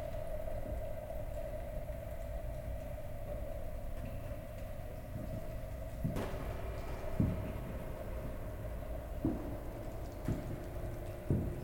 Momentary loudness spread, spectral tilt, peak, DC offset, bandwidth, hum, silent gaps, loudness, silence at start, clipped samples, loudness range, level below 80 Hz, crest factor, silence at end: 8 LU; -7.5 dB/octave; -18 dBFS; under 0.1%; 17 kHz; none; none; -43 LUFS; 0 s; under 0.1%; 4 LU; -44 dBFS; 22 dB; 0 s